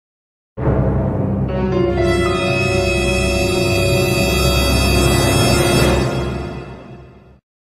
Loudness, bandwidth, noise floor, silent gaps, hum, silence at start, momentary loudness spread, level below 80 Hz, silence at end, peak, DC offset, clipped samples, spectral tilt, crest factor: -16 LUFS; 15 kHz; -40 dBFS; none; none; 0.55 s; 9 LU; -26 dBFS; 0.6 s; 0 dBFS; under 0.1%; under 0.1%; -5 dB/octave; 16 dB